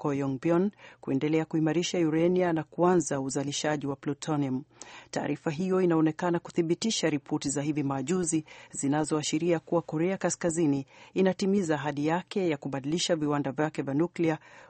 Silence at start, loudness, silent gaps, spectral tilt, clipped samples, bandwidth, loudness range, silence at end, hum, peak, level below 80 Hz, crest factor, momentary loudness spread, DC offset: 0 s; -29 LUFS; none; -5 dB/octave; under 0.1%; 8.8 kHz; 2 LU; 0.05 s; none; -12 dBFS; -66 dBFS; 16 dB; 7 LU; under 0.1%